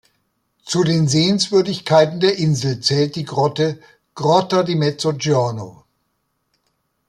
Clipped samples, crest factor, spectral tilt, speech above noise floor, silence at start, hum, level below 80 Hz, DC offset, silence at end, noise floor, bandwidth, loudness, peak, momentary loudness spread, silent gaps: under 0.1%; 16 dB; -5.5 dB/octave; 53 dB; 0.65 s; none; -58 dBFS; under 0.1%; 1.4 s; -70 dBFS; 12 kHz; -17 LUFS; -2 dBFS; 7 LU; none